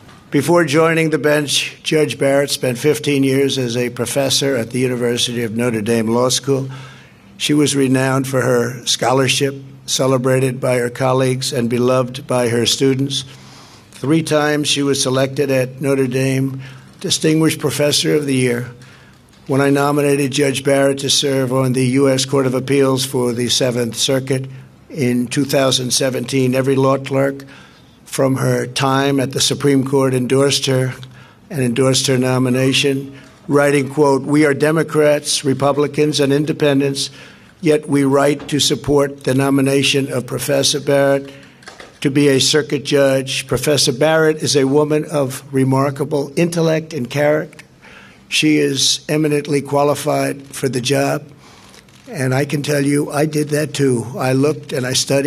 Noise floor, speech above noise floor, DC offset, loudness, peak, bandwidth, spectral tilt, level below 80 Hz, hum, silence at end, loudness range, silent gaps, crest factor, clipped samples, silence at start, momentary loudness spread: -45 dBFS; 29 dB; under 0.1%; -16 LUFS; 0 dBFS; 15 kHz; -4.5 dB/octave; -54 dBFS; none; 0 s; 3 LU; none; 16 dB; under 0.1%; 0.05 s; 7 LU